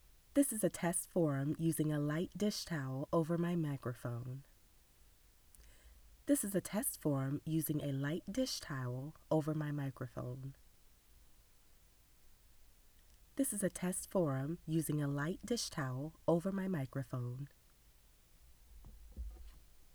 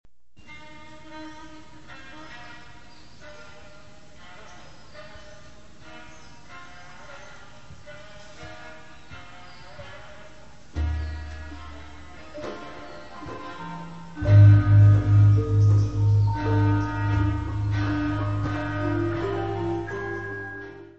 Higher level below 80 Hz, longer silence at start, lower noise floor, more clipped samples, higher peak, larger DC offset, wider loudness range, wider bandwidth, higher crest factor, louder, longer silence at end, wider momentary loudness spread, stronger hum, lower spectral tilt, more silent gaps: second, -62 dBFS vs -40 dBFS; second, 0.35 s vs 0.5 s; first, -66 dBFS vs -51 dBFS; neither; second, -20 dBFS vs -6 dBFS; second, under 0.1% vs 0.7%; second, 9 LU vs 26 LU; first, over 20 kHz vs 6.8 kHz; about the same, 20 dB vs 20 dB; second, -38 LUFS vs -22 LUFS; about the same, 0.1 s vs 0 s; second, 11 LU vs 27 LU; neither; second, -5.5 dB/octave vs -8.5 dB/octave; neither